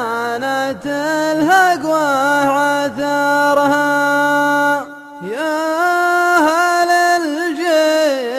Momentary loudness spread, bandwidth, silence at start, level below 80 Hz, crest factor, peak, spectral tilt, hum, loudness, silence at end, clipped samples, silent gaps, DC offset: 7 LU; 15 kHz; 0 s; -60 dBFS; 14 dB; -2 dBFS; -3.5 dB/octave; none; -15 LUFS; 0 s; under 0.1%; none; under 0.1%